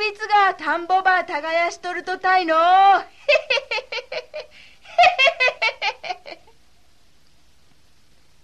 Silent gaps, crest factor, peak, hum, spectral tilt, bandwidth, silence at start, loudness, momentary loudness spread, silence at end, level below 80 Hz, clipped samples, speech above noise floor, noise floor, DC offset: none; 18 dB; -4 dBFS; none; -1.5 dB/octave; 9.8 kHz; 0 s; -18 LUFS; 17 LU; 2.1 s; -62 dBFS; under 0.1%; 41 dB; -59 dBFS; 0.3%